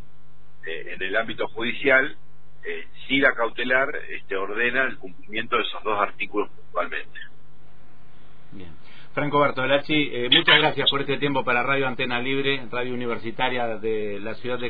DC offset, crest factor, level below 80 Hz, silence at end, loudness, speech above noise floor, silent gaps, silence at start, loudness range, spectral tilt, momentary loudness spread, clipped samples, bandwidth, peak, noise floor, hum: 4%; 22 dB; -54 dBFS; 0 s; -23 LUFS; 31 dB; none; 0.65 s; 9 LU; -7 dB/octave; 14 LU; under 0.1%; 5 kHz; -4 dBFS; -56 dBFS; none